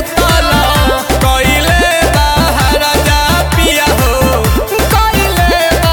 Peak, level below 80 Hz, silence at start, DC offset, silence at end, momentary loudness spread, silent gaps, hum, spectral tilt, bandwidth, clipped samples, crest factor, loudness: 0 dBFS; -16 dBFS; 0 s; under 0.1%; 0 s; 2 LU; none; none; -4 dB/octave; 19.5 kHz; under 0.1%; 10 dB; -10 LUFS